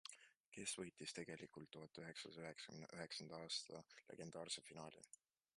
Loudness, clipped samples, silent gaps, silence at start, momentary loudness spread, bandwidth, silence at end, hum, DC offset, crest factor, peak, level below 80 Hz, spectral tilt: -53 LUFS; under 0.1%; 0.40-0.52 s; 0.05 s; 13 LU; 11.5 kHz; 0.5 s; none; under 0.1%; 22 dB; -34 dBFS; -86 dBFS; -2.5 dB/octave